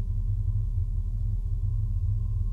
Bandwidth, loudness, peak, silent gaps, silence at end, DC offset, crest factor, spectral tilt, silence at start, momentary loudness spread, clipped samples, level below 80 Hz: 1.2 kHz; -30 LUFS; -16 dBFS; none; 0 s; under 0.1%; 10 dB; -10.5 dB/octave; 0 s; 2 LU; under 0.1%; -28 dBFS